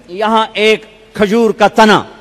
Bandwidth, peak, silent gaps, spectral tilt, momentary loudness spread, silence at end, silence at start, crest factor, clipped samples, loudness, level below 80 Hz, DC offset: 15 kHz; 0 dBFS; none; -4.5 dB/octave; 8 LU; 0.1 s; 0.1 s; 12 dB; under 0.1%; -11 LUFS; -46 dBFS; under 0.1%